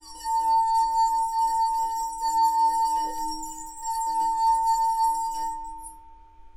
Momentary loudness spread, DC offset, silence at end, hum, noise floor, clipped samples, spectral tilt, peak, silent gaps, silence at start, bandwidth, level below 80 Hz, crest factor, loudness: 12 LU; under 0.1%; 0.1 s; none; -48 dBFS; under 0.1%; -0.5 dB/octave; -14 dBFS; none; 0.05 s; 16.5 kHz; -52 dBFS; 10 dB; -24 LUFS